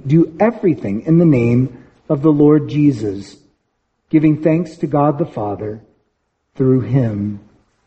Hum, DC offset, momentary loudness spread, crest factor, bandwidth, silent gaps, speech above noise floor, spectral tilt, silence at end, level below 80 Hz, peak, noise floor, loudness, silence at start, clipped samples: none; under 0.1%; 12 LU; 16 dB; 8 kHz; none; 54 dB; -10 dB/octave; 0.5 s; -50 dBFS; 0 dBFS; -68 dBFS; -16 LUFS; 0.05 s; under 0.1%